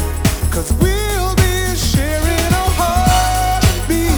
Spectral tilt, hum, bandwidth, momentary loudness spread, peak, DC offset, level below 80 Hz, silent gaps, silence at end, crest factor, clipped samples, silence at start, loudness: -4.5 dB/octave; none; over 20 kHz; 4 LU; 0 dBFS; under 0.1%; -20 dBFS; none; 0 s; 14 dB; under 0.1%; 0 s; -15 LUFS